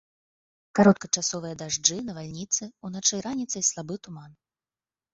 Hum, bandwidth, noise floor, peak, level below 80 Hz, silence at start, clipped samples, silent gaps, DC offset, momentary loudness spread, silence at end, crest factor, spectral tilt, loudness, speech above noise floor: none; 8 kHz; under -90 dBFS; -4 dBFS; -64 dBFS; 0.75 s; under 0.1%; none; under 0.1%; 17 LU; 0.8 s; 24 dB; -3.5 dB/octave; -25 LUFS; over 63 dB